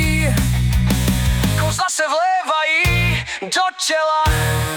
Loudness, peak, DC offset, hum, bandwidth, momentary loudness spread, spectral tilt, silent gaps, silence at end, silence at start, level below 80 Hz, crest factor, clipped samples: -17 LUFS; -6 dBFS; under 0.1%; none; 19.5 kHz; 4 LU; -4 dB/octave; none; 0 s; 0 s; -24 dBFS; 12 dB; under 0.1%